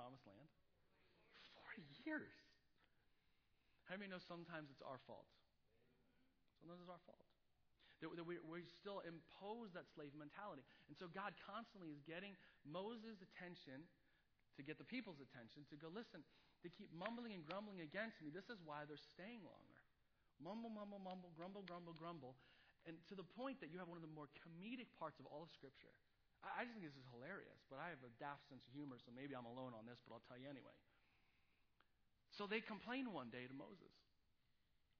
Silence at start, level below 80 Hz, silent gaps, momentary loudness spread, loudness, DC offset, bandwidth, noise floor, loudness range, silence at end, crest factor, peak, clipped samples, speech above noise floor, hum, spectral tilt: 0 s; -88 dBFS; none; 11 LU; -56 LUFS; under 0.1%; 5.4 kHz; -82 dBFS; 5 LU; 0.4 s; 26 dB; -30 dBFS; under 0.1%; 26 dB; none; -4 dB/octave